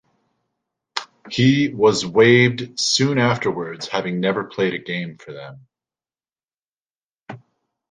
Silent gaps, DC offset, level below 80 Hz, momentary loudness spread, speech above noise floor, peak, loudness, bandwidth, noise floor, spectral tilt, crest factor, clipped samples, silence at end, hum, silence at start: 6.44-6.48 s, 6.80-6.94 s, 7.03-7.14 s; under 0.1%; -58 dBFS; 21 LU; over 71 dB; -2 dBFS; -19 LUFS; 10 kHz; under -90 dBFS; -5 dB/octave; 20 dB; under 0.1%; 0.55 s; none; 0.95 s